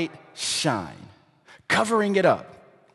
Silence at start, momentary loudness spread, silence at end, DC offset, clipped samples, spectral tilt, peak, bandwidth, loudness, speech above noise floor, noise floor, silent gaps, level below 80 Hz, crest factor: 0 s; 11 LU; 0.4 s; under 0.1%; under 0.1%; -3.5 dB/octave; -4 dBFS; 12.5 kHz; -23 LUFS; 30 dB; -54 dBFS; none; -60 dBFS; 22 dB